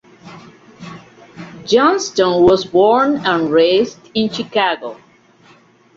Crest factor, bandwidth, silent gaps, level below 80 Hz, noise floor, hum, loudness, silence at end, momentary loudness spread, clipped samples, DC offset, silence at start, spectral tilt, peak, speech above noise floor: 16 dB; 7.8 kHz; none; -52 dBFS; -49 dBFS; none; -14 LUFS; 1 s; 23 LU; under 0.1%; under 0.1%; 0.25 s; -4.5 dB/octave; -2 dBFS; 35 dB